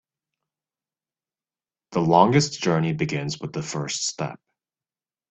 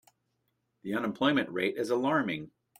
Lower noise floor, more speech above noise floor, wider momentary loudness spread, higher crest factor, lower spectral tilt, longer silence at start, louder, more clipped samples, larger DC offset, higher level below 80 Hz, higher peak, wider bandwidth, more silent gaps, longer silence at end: first, under -90 dBFS vs -78 dBFS; first, over 68 dB vs 49 dB; first, 13 LU vs 9 LU; first, 24 dB vs 18 dB; about the same, -5 dB/octave vs -5.5 dB/octave; first, 1.9 s vs 0.85 s; first, -23 LUFS vs -30 LUFS; neither; neither; first, -60 dBFS vs -72 dBFS; first, -2 dBFS vs -14 dBFS; second, 8.4 kHz vs 16 kHz; neither; first, 0.95 s vs 0.3 s